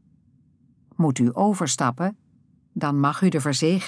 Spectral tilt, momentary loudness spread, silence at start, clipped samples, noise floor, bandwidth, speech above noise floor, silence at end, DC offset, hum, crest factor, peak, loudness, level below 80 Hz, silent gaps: -5.5 dB/octave; 8 LU; 1 s; under 0.1%; -59 dBFS; 11 kHz; 38 dB; 0 s; under 0.1%; none; 16 dB; -8 dBFS; -23 LUFS; -72 dBFS; none